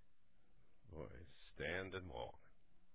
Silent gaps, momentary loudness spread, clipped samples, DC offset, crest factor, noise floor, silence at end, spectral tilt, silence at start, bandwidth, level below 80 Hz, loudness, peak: none; 16 LU; under 0.1%; 0.1%; 22 dB; -76 dBFS; 0 s; -3.5 dB/octave; 0.45 s; 4 kHz; -66 dBFS; -49 LUFS; -32 dBFS